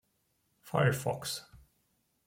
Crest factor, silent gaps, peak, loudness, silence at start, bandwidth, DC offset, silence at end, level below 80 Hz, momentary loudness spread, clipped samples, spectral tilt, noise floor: 22 dB; none; -14 dBFS; -33 LUFS; 0.65 s; 16.5 kHz; under 0.1%; 0.7 s; -66 dBFS; 10 LU; under 0.1%; -5 dB/octave; -77 dBFS